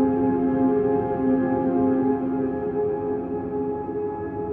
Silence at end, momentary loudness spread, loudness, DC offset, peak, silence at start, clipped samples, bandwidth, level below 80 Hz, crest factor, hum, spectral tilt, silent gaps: 0 s; 7 LU; -24 LUFS; under 0.1%; -10 dBFS; 0 s; under 0.1%; 3 kHz; -50 dBFS; 12 dB; none; -12 dB/octave; none